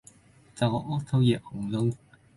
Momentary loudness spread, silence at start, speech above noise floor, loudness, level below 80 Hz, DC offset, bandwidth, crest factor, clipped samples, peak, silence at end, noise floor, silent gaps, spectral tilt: 7 LU; 0.55 s; 30 dB; -28 LUFS; -58 dBFS; under 0.1%; 11.5 kHz; 18 dB; under 0.1%; -12 dBFS; 0.4 s; -56 dBFS; none; -7.5 dB/octave